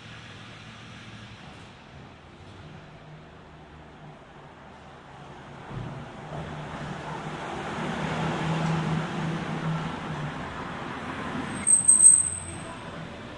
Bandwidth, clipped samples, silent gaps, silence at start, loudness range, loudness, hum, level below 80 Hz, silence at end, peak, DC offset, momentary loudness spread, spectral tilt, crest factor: 11 kHz; under 0.1%; none; 0 s; 25 LU; -23 LUFS; none; -56 dBFS; 0 s; -4 dBFS; under 0.1%; 27 LU; -3 dB/octave; 24 dB